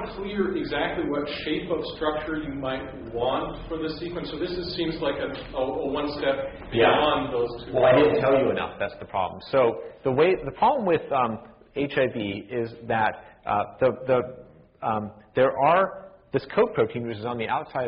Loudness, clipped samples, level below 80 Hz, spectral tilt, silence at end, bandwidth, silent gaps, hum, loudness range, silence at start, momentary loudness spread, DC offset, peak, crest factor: -25 LUFS; under 0.1%; -50 dBFS; -4 dB/octave; 0 s; 5.4 kHz; none; none; 7 LU; 0 s; 11 LU; under 0.1%; -6 dBFS; 18 dB